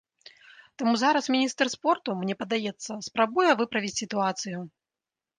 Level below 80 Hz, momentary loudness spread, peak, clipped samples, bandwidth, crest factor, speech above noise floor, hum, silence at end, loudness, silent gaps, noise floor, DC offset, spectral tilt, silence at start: -74 dBFS; 11 LU; -8 dBFS; under 0.1%; 10 kHz; 20 dB; over 64 dB; none; 0.7 s; -26 LUFS; none; under -90 dBFS; under 0.1%; -3.5 dB/octave; 0.8 s